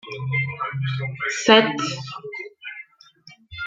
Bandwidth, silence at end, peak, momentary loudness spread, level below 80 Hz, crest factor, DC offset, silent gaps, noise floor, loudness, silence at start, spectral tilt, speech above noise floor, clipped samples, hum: 9.2 kHz; 0 s; -2 dBFS; 21 LU; -62 dBFS; 22 dB; under 0.1%; none; -51 dBFS; -21 LUFS; 0.05 s; -4.5 dB/octave; 30 dB; under 0.1%; none